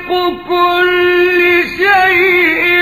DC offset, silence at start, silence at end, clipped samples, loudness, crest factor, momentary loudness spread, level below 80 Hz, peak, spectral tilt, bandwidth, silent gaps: 0.4%; 0 s; 0 s; under 0.1%; -10 LUFS; 10 dB; 6 LU; -46 dBFS; 0 dBFS; -4.5 dB/octave; 15 kHz; none